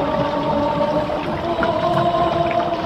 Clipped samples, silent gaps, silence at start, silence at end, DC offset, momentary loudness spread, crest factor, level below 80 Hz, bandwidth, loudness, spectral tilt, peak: under 0.1%; none; 0 s; 0 s; under 0.1%; 4 LU; 14 dB; -42 dBFS; 10.5 kHz; -19 LUFS; -7 dB/octave; -4 dBFS